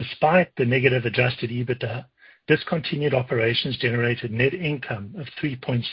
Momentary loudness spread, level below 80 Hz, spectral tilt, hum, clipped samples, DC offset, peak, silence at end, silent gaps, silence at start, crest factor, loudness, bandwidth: 10 LU; -54 dBFS; -11 dB/octave; none; under 0.1%; under 0.1%; -4 dBFS; 0 s; none; 0 s; 20 dB; -23 LUFS; 5.6 kHz